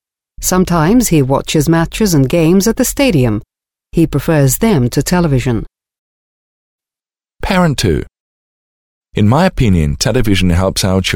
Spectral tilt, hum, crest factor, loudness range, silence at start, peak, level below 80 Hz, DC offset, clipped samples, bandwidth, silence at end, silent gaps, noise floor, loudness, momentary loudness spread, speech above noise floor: -5.5 dB/octave; none; 12 dB; 7 LU; 0.4 s; 0 dBFS; -28 dBFS; under 0.1%; under 0.1%; 19.5 kHz; 0 s; 5.99-6.79 s, 8.20-9.01 s; under -90 dBFS; -12 LUFS; 6 LU; over 79 dB